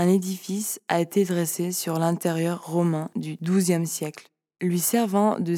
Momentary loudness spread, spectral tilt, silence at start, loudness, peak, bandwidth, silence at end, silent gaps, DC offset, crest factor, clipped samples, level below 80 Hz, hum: 8 LU; -5.5 dB/octave; 0 s; -25 LUFS; -8 dBFS; 17.5 kHz; 0 s; none; under 0.1%; 18 dB; under 0.1%; -84 dBFS; none